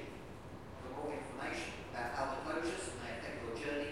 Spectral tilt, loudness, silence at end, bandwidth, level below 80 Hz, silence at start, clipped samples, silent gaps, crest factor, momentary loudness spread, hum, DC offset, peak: -4.5 dB/octave; -42 LUFS; 0 s; 16 kHz; -60 dBFS; 0 s; under 0.1%; none; 18 dB; 11 LU; none; 0.1%; -24 dBFS